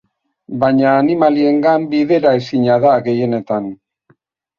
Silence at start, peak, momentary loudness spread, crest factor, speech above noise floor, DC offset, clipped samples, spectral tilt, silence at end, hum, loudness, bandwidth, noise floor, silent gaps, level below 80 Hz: 0.5 s; -2 dBFS; 8 LU; 14 dB; 44 dB; under 0.1%; under 0.1%; -8.5 dB/octave; 0.85 s; none; -14 LUFS; 7 kHz; -57 dBFS; none; -58 dBFS